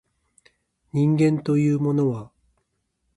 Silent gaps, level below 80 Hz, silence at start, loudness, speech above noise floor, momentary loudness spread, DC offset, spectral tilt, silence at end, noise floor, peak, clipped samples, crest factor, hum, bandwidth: none; -62 dBFS; 0.95 s; -22 LUFS; 53 dB; 9 LU; under 0.1%; -9 dB/octave; 0.9 s; -74 dBFS; -8 dBFS; under 0.1%; 14 dB; none; 11 kHz